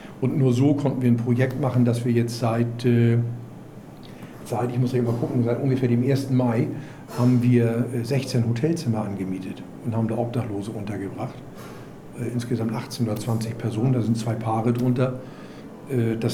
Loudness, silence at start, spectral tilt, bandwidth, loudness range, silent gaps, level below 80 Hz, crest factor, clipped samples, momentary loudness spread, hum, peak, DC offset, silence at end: -23 LUFS; 0 s; -8 dB/octave; 14 kHz; 7 LU; none; -56 dBFS; 16 dB; under 0.1%; 19 LU; none; -6 dBFS; under 0.1%; 0 s